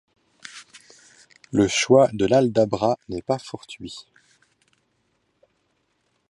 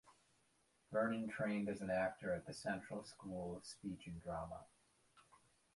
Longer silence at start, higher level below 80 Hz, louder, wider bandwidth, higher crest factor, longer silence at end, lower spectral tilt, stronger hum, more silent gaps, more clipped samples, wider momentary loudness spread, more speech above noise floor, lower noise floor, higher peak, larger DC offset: first, 0.55 s vs 0.05 s; first, -56 dBFS vs -70 dBFS; first, -20 LUFS vs -44 LUFS; about the same, 11.5 kHz vs 11.5 kHz; about the same, 22 dB vs 20 dB; first, 2.3 s vs 0.55 s; about the same, -5 dB/octave vs -6 dB/octave; neither; neither; neither; first, 24 LU vs 10 LU; first, 49 dB vs 34 dB; second, -70 dBFS vs -78 dBFS; first, -2 dBFS vs -26 dBFS; neither